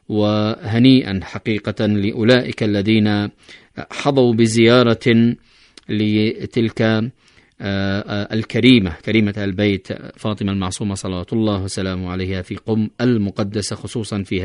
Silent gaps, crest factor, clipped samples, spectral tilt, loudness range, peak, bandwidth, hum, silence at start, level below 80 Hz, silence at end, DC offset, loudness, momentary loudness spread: none; 18 dB; under 0.1%; -6 dB/octave; 5 LU; 0 dBFS; 11 kHz; none; 0.1 s; -48 dBFS; 0 s; under 0.1%; -18 LUFS; 12 LU